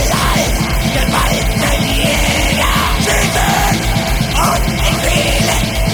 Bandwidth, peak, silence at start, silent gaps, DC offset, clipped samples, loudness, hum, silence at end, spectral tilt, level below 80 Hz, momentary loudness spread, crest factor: 19.5 kHz; 0 dBFS; 0 s; none; under 0.1%; under 0.1%; -13 LUFS; none; 0 s; -3.5 dB/octave; -18 dBFS; 2 LU; 12 dB